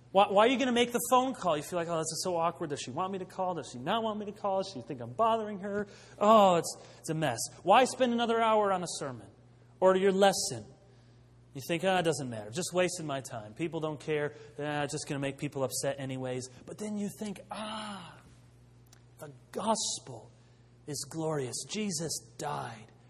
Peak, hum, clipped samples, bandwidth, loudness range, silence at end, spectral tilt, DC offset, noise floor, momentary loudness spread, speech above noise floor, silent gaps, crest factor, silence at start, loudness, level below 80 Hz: -8 dBFS; none; under 0.1%; 14 kHz; 10 LU; 0.25 s; -4 dB/octave; under 0.1%; -59 dBFS; 16 LU; 28 dB; none; 22 dB; 0.15 s; -31 LUFS; -68 dBFS